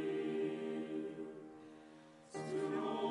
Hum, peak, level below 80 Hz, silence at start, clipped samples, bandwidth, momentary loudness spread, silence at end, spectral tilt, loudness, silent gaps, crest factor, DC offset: none; -28 dBFS; -84 dBFS; 0 s; under 0.1%; 11.5 kHz; 18 LU; 0 s; -6 dB/octave; -42 LUFS; none; 14 dB; under 0.1%